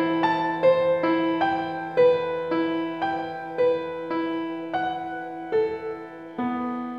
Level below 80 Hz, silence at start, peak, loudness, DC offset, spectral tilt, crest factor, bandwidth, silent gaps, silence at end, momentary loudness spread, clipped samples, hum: -66 dBFS; 0 s; -8 dBFS; -25 LUFS; under 0.1%; -7.5 dB/octave; 16 dB; 5.8 kHz; none; 0 s; 11 LU; under 0.1%; none